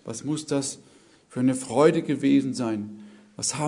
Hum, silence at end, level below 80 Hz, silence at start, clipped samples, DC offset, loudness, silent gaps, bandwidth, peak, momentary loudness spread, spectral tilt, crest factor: none; 0 s; -68 dBFS; 0.05 s; under 0.1%; under 0.1%; -25 LUFS; none; 11 kHz; -6 dBFS; 13 LU; -5 dB/octave; 20 dB